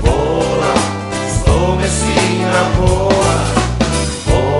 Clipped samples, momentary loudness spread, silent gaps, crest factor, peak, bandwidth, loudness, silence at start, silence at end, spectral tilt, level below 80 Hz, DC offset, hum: under 0.1%; 3 LU; none; 14 dB; 0 dBFS; 11.5 kHz; -14 LUFS; 0 s; 0 s; -5 dB/octave; -22 dBFS; under 0.1%; none